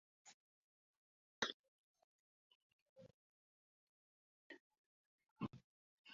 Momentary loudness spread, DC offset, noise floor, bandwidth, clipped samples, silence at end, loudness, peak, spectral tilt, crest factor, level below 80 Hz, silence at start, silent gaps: 22 LU; under 0.1%; under -90 dBFS; 7 kHz; under 0.1%; 0 s; -48 LUFS; -26 dBFS; -2 dB/octave; 32 dB; -86 dBFS; 0.25 s; 0.34-1.42 s, 1.54-1.94 s, 2.04-2.96 s, 3.14-4.50 s, 4.60-4.70 s, 4.78-5.18 s, 5.31-5.36 s, 5.64-6.04 s